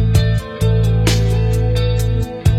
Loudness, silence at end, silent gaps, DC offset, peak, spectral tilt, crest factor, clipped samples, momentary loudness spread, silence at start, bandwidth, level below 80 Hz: -16 LUFS; 0 s; none; under 0.1%; -2 dBFS; -6 dB/octave; 14 dB; under 0.1%; 4 LU; 0 s; 14.5 kHz; -20 dBFS